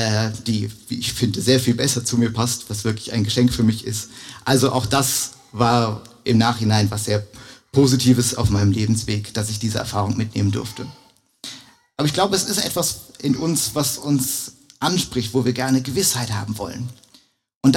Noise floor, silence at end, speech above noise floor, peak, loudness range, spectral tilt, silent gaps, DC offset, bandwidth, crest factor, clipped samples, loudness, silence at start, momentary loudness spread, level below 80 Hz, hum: -55 dBFS; 0 s; 35 dB; -2 dBFS; 4 LU; -4.5 dB/octave; 17.55-17.61 s; under 0.1%; 17 kHz; 18 dB; under 0.1%; -20 LUFS; 0 s; 11 LU; -46 dBFS; none